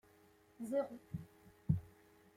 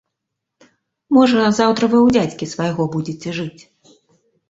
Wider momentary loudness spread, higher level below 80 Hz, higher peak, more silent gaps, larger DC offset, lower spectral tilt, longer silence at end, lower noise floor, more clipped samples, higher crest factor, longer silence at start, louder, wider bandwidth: first, 17 LU vs 12 LU; second, -62 dBFS vs -54 dBFS; second, -20 dBFS vs -2 dBFS; neither; neither; first, -9 dB/octave vs -6 dB/octave; second, 0.45 s vs 1 s; second, -68 dBFS vs -79 dBFS; neither; first, 24 dB vs 16 dB; second, 0.6 s vs 1.1 s; second, -43 LUFS vs -17 LUFS; first, 15.5 kHz vs 8 kHz